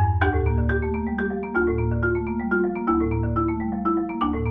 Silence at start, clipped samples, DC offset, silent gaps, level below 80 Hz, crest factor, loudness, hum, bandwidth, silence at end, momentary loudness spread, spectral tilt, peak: 0 s; under 0.1%; under 0.1%; none; -32 dBFS; 14 dB; -24 LUFS; none; 3.8 kHz; 0 s; 4 LU; -11 dB/octave; -8 dBFS